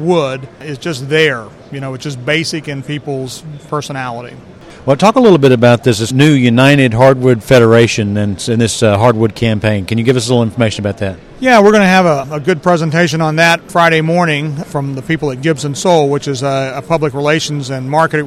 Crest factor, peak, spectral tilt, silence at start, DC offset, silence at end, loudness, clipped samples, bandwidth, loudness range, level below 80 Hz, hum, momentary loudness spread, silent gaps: 12 dB; 0 dBFS; -5.5 dB/octave; 0 s; under 0.1%; 0 s; -12 LUFS; 0.6%; 15 kHz; 8 LU; -44 dBFS; none; 14 LU; none